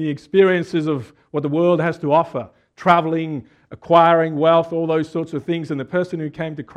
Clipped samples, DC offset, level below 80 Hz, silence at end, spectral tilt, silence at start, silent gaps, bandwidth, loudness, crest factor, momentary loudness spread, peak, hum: under 0.1%; under 0.1%; -62 dBFS; 0.15 s; -7.5 dB/octave; 0 s; none; 9.4 kHz; -19 LUFS; 18 dB; 12 LU; 0 dBFS; none